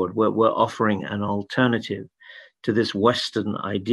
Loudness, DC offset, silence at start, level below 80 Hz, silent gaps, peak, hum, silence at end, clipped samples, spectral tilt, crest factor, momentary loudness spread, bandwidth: -23 LUFS; under 0.1%; 0 s; -64 dBFS; none; -4 dBFS; none; 0 s; under 0.1%; -6 dB/octave; 20 dB; 10 LU; 12 kHz